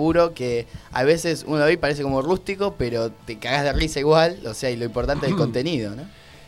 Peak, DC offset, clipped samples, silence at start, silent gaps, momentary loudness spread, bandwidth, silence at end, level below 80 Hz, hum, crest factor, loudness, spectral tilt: -4 dBFS; 0.1%; under 0.1%; 0 s; none; 10 LU; 15.5 kHz; 0.1 s; -38 dBFS; none; 18 dB; -22 LUFS; -5.5 dB/octave